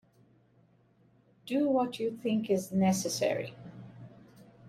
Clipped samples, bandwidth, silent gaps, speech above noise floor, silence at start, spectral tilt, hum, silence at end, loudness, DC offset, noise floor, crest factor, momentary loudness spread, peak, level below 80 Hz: under 0.1%; 15.5 kHz; none; 36 dB; 1.45 s; -5.5 dB/octave; none; 0 s; -31 LUFS; under 0.1%; -65 dBFS; 18 dB; 22 LU; -16 dBFS; -72 dBFS